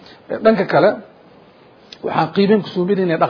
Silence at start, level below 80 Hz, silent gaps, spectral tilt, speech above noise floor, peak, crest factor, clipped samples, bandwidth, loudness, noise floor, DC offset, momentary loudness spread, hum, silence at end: 0.3 s; -58 dBFS; none; -8.5 dB/octave; 31 dB; 0 dBFS; 18 dB; under 0.1%; 5.4 kHz; -16 LUFS; -46 dBFS; under 0.1%; 14 LU; none; 0 s